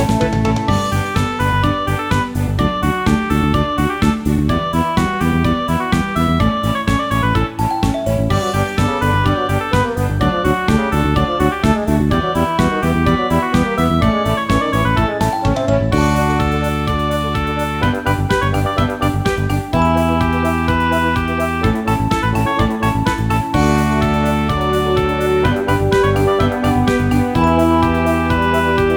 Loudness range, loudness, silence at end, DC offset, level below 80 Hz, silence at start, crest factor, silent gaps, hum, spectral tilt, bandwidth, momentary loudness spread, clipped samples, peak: 2 LU; -16 LUFS; 0 s; under 0.1%; -26 dBFS; 0 s; 14 dB; none; none; -6.5 dB/octave; over 20 kHz; 3 LU; under 0.1%; 0 dBFS